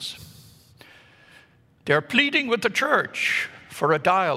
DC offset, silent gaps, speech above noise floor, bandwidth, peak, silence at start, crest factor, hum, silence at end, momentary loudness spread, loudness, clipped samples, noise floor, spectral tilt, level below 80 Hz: under 0.1%; none; 33 dB; 16 kHz; -2 dBFS; 0 s; 22 dB; none; 0 s; 14 LU; -22 LUFS; under 0.1%; -55 dBFS; -4 dB/octave; -68 dBFS